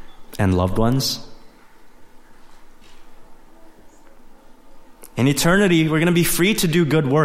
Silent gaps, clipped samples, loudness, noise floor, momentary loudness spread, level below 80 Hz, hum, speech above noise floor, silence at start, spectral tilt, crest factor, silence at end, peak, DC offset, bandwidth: none; under 0.1%; -18 LUFS; -43 dBFS; 8 LU; -38 dBFS; none; 26 dB; 0 s; -5 dB/octave; 18 dB; 0 s; -2 dBFS; under 0.1%; 16.5 kHz